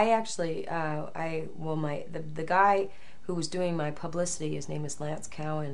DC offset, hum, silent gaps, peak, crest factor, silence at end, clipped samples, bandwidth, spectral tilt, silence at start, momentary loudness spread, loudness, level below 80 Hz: 2%; none; none; -10 dBFS; 22 dB; 0 s; under 0.1%; 11.5 kHz; -5 dB/octave; 0 s; 12 LU; -31 LUFS; -60 dBFS